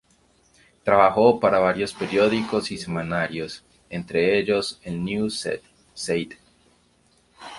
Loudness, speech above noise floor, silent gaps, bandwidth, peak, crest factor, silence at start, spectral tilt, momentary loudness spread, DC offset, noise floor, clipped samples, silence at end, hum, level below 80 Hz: -22 LUFS; 39 dB; none; 11.5 kHz; -2 dBFS; 22 dB; 0.85 s; -5 dB/octave; 17 LU; under 0.1%; -61 dBFS; under 0.1%; 0 s; none; -56 dBFS